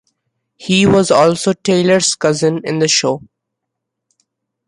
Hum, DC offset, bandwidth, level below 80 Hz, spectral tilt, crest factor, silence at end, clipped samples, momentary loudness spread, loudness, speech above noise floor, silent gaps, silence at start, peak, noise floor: none; under 0.1%; 11.5 kHz; -50 dBFS; -4 dB/octave; 14 dB; 1.5 s; under 0.1%; 7 LU; -13 LUFS; 64 dB; none; 0.6 s; 0 dBFS; -77 dBFS